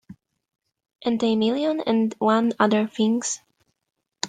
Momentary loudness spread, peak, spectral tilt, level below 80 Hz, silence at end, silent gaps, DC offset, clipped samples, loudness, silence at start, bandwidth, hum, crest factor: 7 LU; -6 dBFS; -4.5 dB/octave; -70 dBFS; 0 s; none; under 0.1%; under 0.1%; -22 LUFS; 0.1 s; 9.4 kHz; none; 18 dB